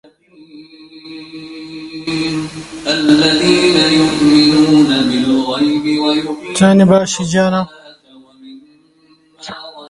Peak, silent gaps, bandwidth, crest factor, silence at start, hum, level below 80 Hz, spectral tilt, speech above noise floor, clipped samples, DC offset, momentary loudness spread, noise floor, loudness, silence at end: 0 dBFS; none; 11.5 kHz; 14 dB; 0.55 s; none; -48 dBFS; -5 dB/octave; 39 dB; under 0.1%; under 0.1%; 21 LU; -51 dBFS; -12 LUFS; 0.05 s